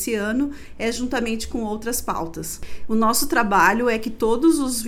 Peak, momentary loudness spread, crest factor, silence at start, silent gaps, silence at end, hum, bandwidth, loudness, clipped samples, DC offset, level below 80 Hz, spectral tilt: -2 dBFS; 11 LU; 18 dB; 0 s; none; 0 s; none; 18.5 kHz; -21 LUFS; under 0.1%; under 0.1%; -40 dBFS; -3.5 dB/octave